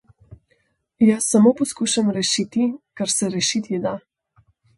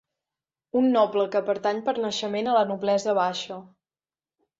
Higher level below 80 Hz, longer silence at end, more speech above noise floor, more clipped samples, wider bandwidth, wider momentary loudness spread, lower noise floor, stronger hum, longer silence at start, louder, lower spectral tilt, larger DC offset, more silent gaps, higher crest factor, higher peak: first, -62 dBFS vs -72 dBFS; second, 0.8 s vs 0.95 s; second, 47 dB vs over 66 dB; neither; first, 11.5 kHz vs 7.8 kHz; first, 10 LU vs 7 LU; second, -66 dBFS vs under -90 dBFS; neither; second, 0.3 s vs 0.75 s; first, -20 LUFS vs -24 LUFS; about the same, -4 dB/octave vs -4.5 dB/octave; neither; neither; about the same, 18 dB vs 16 dB; first, -4 dBFS vs -8 dBFS